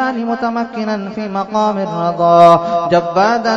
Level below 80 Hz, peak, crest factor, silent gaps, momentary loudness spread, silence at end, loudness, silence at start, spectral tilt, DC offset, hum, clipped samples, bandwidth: -56 dBFS; 0 dBFS; 14 dB; none; 12 LU; 0 s; -14 LUFS; 0 s; -6.5 dB/octave; under 0.1%; none; 0.3%; 8.4 kHz